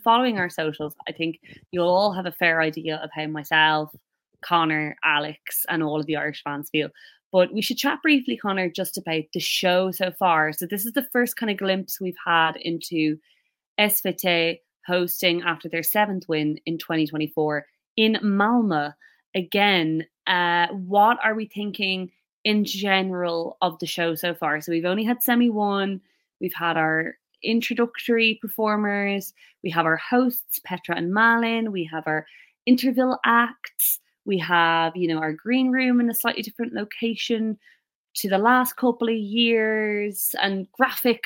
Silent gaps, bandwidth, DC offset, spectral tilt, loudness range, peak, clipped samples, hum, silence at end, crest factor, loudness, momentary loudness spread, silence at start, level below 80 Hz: 7.24-7.31 s, 13.66-13.76 s, 17.87-17.96 s, 19.26-19.33 s, 22.33-22.44 s, 37.95-38.14 s; 17 kHz; under 0.1%; -4 dB/octave; 3 LU; -4 dBFS; under 0.1%; none; 0.1 s; 18 dB; -23 LUFS; 10 LU; 0 s; -72 dBFS